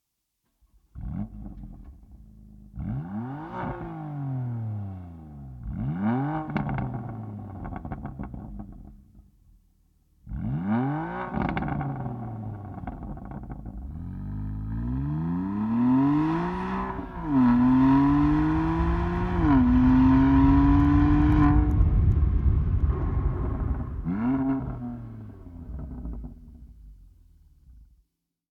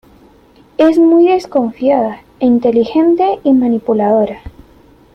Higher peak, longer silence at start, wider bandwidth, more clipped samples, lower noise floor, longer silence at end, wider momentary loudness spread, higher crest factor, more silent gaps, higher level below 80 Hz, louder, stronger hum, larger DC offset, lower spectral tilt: second, -8 dBFS vs -2 dBFS; first, 0.95 s vs 0.8 s; second, 5.4 kHz vs 6.4 kHz; neither; first, -78 dBFS vs -45 dBFS; about the same, 0.65 s vs 0.65 s; first, 20 LU vs 9 LU; about the same, 16 dB vs 12 dB; neither; first, -32 dBFS vs -46 dBFS; second, -25 LUFS vs -12 LUFS; neither; neither; first, -10 dB/octave vs -7.5 dB/octave